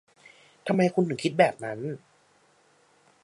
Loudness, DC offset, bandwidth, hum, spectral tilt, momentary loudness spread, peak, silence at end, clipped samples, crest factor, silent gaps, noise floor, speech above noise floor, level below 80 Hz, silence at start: -26 LUFS; under 0.1%; 11.5 kHz; none; -6.5 dB/octave; 14 LU; -6 dBFS; 1.25 s; under 0.1%; 22 dB; none; -63 dBFS; 38 dB; -74 dBFS; 0.65 s